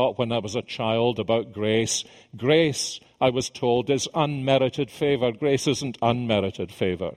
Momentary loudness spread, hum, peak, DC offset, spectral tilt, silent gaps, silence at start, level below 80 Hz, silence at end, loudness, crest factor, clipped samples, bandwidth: 6 LU; none; -6 dBFS; under 0.1%; -4.5 dB/octave; none; 0 s; -58 dBFS; 0 s; -24 LUFS; 18 dB; under 0.1%; 15.5 kHz